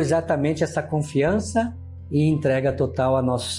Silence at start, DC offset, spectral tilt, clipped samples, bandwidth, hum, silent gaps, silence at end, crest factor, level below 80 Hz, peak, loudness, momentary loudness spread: 0 s; under 0.1%; -6.5 dB/octave; under 0.1%; 11.5 kHz; none; none; 0 s; 12 dB; -50 dBFS; -10 dBFS; -22 LUFS; 5 LU